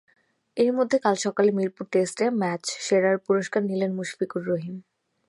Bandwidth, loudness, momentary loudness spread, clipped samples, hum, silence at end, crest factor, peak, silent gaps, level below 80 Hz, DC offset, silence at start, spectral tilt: 11.5 kHz; -25 LUFS; 8 LU; under 0.1%; none; 0.45 s; 18 dB; -6 dBFS; none; -76 dBFS; under 0.1%; 0.55 s; -5 dB/octave